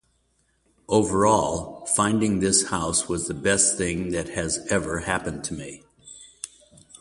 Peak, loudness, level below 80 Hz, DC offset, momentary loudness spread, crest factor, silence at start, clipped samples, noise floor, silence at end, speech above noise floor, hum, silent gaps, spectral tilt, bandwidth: -6 dBFS; -23 LUFS; -46 dBFS; under 0.1%; 19 LU; 20 dB; 0.9 s; under 0.1%; -68 dBFS; 0.55 s; 44 dB; none; none; -3.5 dB/octave; 11.5 kHz